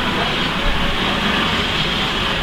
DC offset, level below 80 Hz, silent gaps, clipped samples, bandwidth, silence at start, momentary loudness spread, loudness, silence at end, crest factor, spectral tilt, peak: under 0.1%; -28 dBFS; none; under 0.1%; 16.5 kHz; 0 s; 2 LU; -17 LUFS; 0 s; 14 dB; -4 dB/octave; -4 dBFS